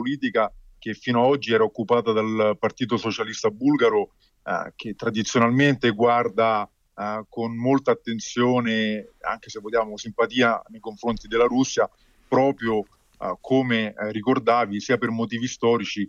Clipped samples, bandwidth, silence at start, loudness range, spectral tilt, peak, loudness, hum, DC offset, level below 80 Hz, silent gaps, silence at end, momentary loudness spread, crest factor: under 0.1%; 7.4 kHz; 0 s; 2 LU; -5 dB/octave; -8 dBFS; -23 LUFS; none; under 0.1%; -56 dBFS; none; 0 s; 10 LU; 14 dB